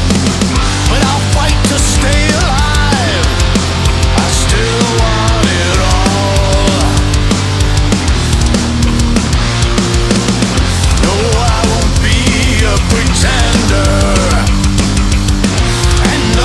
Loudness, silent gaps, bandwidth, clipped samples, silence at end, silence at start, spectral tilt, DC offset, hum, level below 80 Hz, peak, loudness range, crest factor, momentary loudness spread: -11 LUFS; none; 12 kHz; under 0.1%; 0 s; 0 s; -4.5 dB/octave; under 0.1%; none; -14 dBFS; 0 dBFS; 1 LU; 10 dB; 2 LU